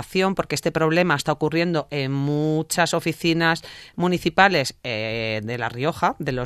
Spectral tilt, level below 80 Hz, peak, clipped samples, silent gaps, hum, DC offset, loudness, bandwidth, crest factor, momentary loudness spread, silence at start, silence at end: -5 dB/octave; -52 dBFS; 0 dBFS; under 0.1%; none; none; under 0.1%; -22 LUFS; 14 kHz; 22 dB; 8 LU; 0 s; 0 s